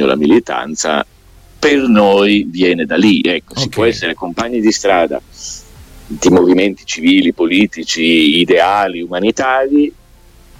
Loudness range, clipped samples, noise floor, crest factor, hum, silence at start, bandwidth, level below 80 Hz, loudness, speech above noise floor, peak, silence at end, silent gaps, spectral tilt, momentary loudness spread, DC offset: 3 LU; under 0.1%; -43 dBFS; 12 dB; none; 0 s; 15 kHz; -42 dBFS; -12 LUFS; 30 dB; 0 dBFS; 0.7 s; none; -4 dB/octave; 9 LU; under 0.1%